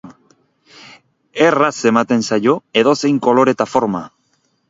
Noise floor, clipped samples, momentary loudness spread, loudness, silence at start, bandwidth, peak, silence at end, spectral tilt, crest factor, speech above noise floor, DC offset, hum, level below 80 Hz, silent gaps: -63 dBFS; under 0.1%; 5 LU; -15 LUFS; 0.05 s; 8 kHz; 0 dBFS; 0.6 s; -5 dB/octave; 16 dB; 48 dB; under 0.1%; none; -60 dBFS; none